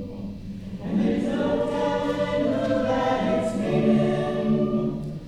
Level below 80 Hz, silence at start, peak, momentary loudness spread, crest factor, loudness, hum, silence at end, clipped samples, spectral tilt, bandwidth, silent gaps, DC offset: -46 dBFS; 0 s; -8 dBFS; 13 LU; 16 dB; -24 LUFS; none; 0 s; under 0.1%; -7.5 dB/octave; 10.5 kHz; none; under 0.1%